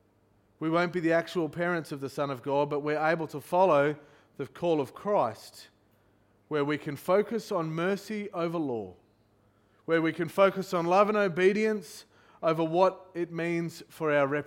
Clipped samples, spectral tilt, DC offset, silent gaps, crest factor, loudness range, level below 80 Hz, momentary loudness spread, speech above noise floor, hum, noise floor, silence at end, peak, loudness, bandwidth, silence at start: under 0.1%; -6.5 dB/octave; under 0.1%; none; 20 dB; 5 LU; -72 dBFS; 12 LU; 38 dB; none; -66 dBFS; 0.05 s; -10 dBFS; -29 LUFS; 17 kHz; 0.6 s